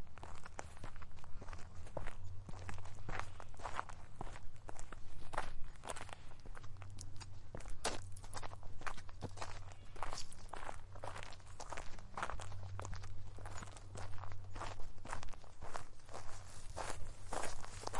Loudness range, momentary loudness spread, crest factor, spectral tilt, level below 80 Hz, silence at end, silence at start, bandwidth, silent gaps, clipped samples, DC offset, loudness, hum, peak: 3 LU; 9 LU; 18 dB; -3.5 dB/octave; -50 dBFS; 0 s; 0 s; 11.5 kHz; none; under 0.1%; under 0.1%; -50 LUFS; none; -20 dBFS